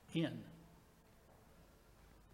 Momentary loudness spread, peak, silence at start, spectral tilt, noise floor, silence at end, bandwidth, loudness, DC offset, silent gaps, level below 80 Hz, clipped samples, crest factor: 25 LU; -28 dBFS; 0.1 s; -6.5 dB/octave; -66 dBFS; 0.1 s; 16 kHz; -44 LUFS; under 0.1%; none; -70 dBFS; under 0.1%; 22 dB